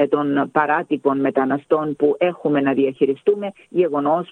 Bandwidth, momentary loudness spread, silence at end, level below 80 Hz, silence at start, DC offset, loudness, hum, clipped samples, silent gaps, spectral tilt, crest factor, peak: 4.1 kHz; 3 LU; 0.05 s; -66 dBFS; 0 s; under 0.1%; -19 LUFS; none; under 0.1%; none; -8.5 dB/octave; 16 dB; -2 dBFS